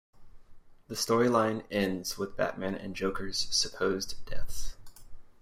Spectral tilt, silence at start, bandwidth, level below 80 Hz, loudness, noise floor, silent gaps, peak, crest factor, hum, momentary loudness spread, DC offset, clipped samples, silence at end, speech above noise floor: -3.5 dB/octave; 0.15 s; 16 kHz; -46 dBFS; -31 LUFS; -50 dBFS; none; -12 dBFS; 18 dB; none; 16 LU; under 0.1%; under 0.1%; 0.1 s; 21 dB